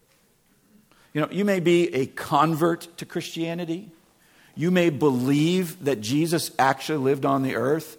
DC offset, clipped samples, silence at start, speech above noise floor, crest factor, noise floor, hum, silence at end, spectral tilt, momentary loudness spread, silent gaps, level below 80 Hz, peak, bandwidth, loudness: under 0.1%; under 0.1%; 1.15 s; 39 dB; 20 dB; -62 dBFS; none; 0.05 s; -5.5 dB/octave; 11 LU; none; -66 dBFS; -6 dBFS; 18 kHz; -24 LUFS